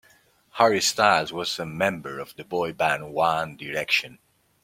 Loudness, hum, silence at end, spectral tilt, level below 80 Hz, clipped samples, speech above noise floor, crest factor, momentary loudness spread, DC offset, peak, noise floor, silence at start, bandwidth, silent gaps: -24 LUFS; none; 0.5 s; -3 dB/octave; -64 dBFS; under 0.1%; 35 dB; 22 dB; 14 LU; under 0.1%; -4 dBFS; -59 dBFS; 0.55 s; 16.5 kHz; none